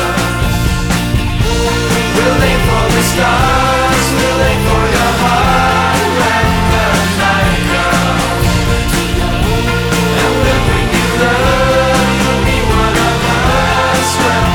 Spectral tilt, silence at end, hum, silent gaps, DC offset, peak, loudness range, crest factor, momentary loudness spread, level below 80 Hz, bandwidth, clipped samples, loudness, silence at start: -4.5 dB/octave; 0 s; none; none; under 0.1%; 0 dBFS; 2 LU; 10 dB; 3 LU; -20 dBFS; 18 kHz; under 0.1%; -11 LUFS; 0 s